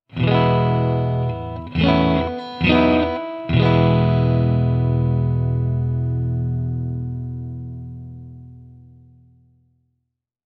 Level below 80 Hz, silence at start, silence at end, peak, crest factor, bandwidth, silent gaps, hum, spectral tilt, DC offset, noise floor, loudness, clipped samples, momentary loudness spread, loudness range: -36 dBFS; 0.15 s; 1.75 s; -2 dBFS; 18 dB; 5.8 kHz; none; none; -9.5 dB/octave; under 0.1%; -77 dBFS; -19 LUFS; under 0.1%; 15 LU; 14 LU